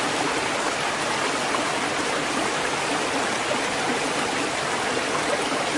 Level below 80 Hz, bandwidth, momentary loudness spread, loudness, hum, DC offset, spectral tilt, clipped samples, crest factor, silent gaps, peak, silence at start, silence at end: -56 dBFS; 11.5 kHz; 1 LU; -24 LUFS; none; under 0.1%; -2 dB/octave; under 0.1%; 14 dB; none; -10 dBFS; 0 s; 0 s